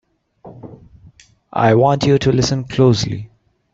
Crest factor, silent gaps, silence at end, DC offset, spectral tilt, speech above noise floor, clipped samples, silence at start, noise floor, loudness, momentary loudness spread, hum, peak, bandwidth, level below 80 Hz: 16 dB; none; 0.45 s; under 0.1%; -6 dB/octave; 33 dB; under 0.1%; 0.45 s; -47 dBFS; -15 LUFS; 14 LU; none; -2 dBFS; 7.8 kHz; -44 dBFS